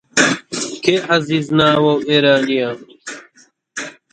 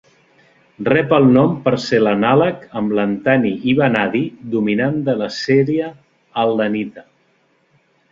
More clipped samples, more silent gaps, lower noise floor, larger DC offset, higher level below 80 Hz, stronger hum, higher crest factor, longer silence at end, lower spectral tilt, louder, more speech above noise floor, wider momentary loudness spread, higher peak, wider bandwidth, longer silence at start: neither; neither; second, -53 dBFS vs -60 dBFS; neither; about the same, -58 dBFS vs -56 dBFS; neither; about the same, 16 dB vs 16 dB; second, 0.2 s vs 1.1 s; second, -4 dB/octave vs -7 dB/octave; about the same, -15 LUFS vs -16 LUFS; second, 38 dB vs 44 dB; first, 19 LU vs 9 LU; about the same, 0 dBFS vs 0 dBFS; first, 9.4 kHz vs 7.6 kHz; second, 0.15 s vs 0.8 s